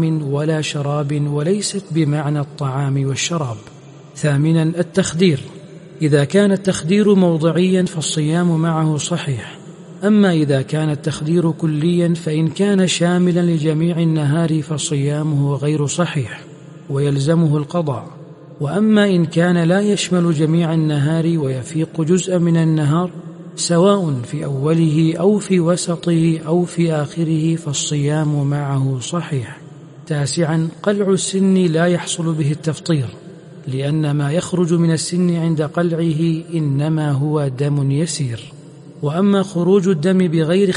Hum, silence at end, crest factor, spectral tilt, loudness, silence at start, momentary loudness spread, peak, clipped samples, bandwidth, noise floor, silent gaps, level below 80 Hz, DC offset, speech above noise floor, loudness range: none; 0 s; 16 dB; -6 dB/octave; -17 LUFS; 0 s; 8 LU; 0 dBFS; under 0.1%; 11.5 kHz; -37 dBFS; none; -56 dBFS; under 0.1%; 21 dB; 3 LU